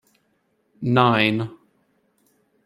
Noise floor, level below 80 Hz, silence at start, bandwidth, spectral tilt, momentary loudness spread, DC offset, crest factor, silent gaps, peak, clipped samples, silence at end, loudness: -68 dBFS; -64 dBFS; 0.8 s; 12.5 kHz; -7.5 dB/octave; 14 LU; under 0.1%; 22 dB; none; -2 dBFS; under 0.1%; 1.1 s; -20 LUFS